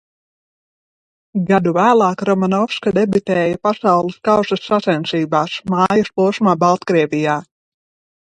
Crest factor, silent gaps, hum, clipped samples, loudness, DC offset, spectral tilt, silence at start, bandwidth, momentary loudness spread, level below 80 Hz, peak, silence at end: 16 dB; none; none; under 0.1%; -16 LUFS; under 0.1%; -6.5 dB/octave; 1.35 s; 9.4 kHz; 5 LU; -56 dBFS; 0 dBFS; 0.9 s